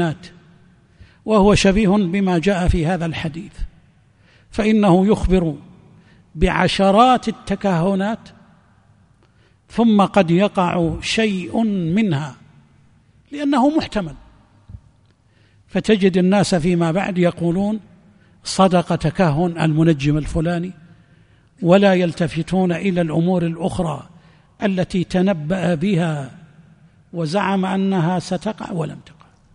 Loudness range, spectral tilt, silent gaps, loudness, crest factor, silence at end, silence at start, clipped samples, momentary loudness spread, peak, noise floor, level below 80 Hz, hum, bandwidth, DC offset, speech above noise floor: 4 LU; -6.5 dB/octave; none; -18 LUFS; 18 dB; 0.55 s; 0 s; under 0.1%; 14 LU; 0 dBFS; -55 dBFS; -36 dBFS; none; 10.5 kHz; under 0.1%; 38 dB